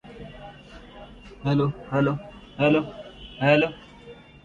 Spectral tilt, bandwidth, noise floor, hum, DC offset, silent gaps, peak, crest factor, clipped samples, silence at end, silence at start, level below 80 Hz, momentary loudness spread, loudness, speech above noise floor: -8 dB/octave; 7.4 kHz; -46 dBFS; none; under 0.1%; none; -6 dBFS; 20 dB; under 0.1%; 0.3 s; 0.05 s; -50 dBFS; 24 LU; -24 LUFS; 24 dB